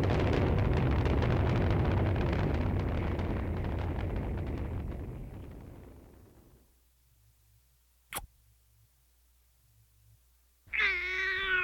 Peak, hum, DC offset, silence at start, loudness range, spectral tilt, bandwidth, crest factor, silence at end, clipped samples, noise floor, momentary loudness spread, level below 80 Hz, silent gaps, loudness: -16 dBFS; none; under 0.1%; 0 s; 20 LU; -6.5 dB/octave; 16.5 kHz; 18 dB; 0 s; under 0.1%; -67 dBFS; 16 LU; -40 dBFS; none; -32 LUFS